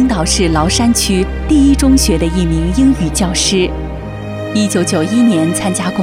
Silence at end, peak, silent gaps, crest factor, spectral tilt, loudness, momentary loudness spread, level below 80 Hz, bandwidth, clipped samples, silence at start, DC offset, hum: 0 s; 0 dBFS; none; 12 dB; -4.5 dB/octave; -12 LUFS; 8 LU; -22 dBFS; 16 kHz; under 0.1%; 0 s; under 0.1%; none